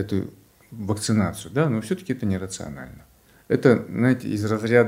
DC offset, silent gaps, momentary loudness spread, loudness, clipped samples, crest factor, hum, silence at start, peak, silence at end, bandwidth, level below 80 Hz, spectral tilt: under 0.1%; none; 17 LU; -23 LUFS; under 0.1%; 20 dB; none; 0 s; -2 dBFS; 0 s; 16 kHz; -54 dBFS; -6.5 dB/octave